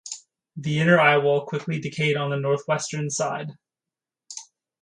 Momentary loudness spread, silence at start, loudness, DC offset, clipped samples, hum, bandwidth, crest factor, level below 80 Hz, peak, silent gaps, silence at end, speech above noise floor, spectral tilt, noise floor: 22 LU; 0.05 s; -23 LUFS; under 0.1%; under 0.1%; none; 11 kHz; 20 dB; -68 dBFS; -4 dBFS; none; 0.4 s; 67 dB; -5 dB/octave; -89 dBFS